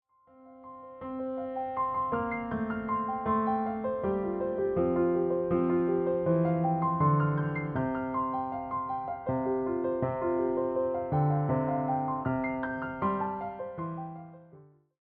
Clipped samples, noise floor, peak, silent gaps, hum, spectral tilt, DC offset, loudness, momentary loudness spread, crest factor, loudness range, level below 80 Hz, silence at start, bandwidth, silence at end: under 0.1%; -56 dBFS; -16 dBFS; none; none; -9 dB/octave; under 0.1%; -30 LUFS; 10 LU; 14 dB; 4 LU; -60 dBFS; 0.4 s; 3.8 kHz; 0.4 s